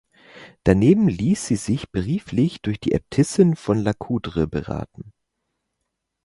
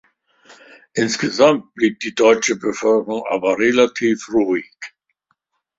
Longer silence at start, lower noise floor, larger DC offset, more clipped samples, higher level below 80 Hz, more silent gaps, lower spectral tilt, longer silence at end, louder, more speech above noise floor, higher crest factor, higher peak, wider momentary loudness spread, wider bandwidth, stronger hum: second, 0.35 s vs 0.95 s; first, -78 dBFS vs -69 dBFS; neither; neither; first, -42 dBFS vs -60 dBFS; neither; first, -7 dB/octave vs -4 dB/octave; first, 1.15 s vs 0.9 s; second, -21 LUFS vs -17 LUFS; first, 58 dB vs 52 dB; about the same, 20 dB vs 18 dB; about the same, -2 dBFS vs 0 dBFS; about the same, 9 LU vs 9 LU; first, 11.5 kHz vs 7.8 kHz; neither